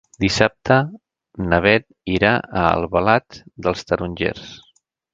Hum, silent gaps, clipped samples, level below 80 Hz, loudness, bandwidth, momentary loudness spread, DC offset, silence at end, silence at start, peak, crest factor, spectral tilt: none; none; under 0.1%; -40 dBFS; -19 LUFS; 9.2 kHz; 9 LU; under 0.1%; 0.55 s; 0.2 s; 0 dBFS; 20 dB; -5.5 dB/octave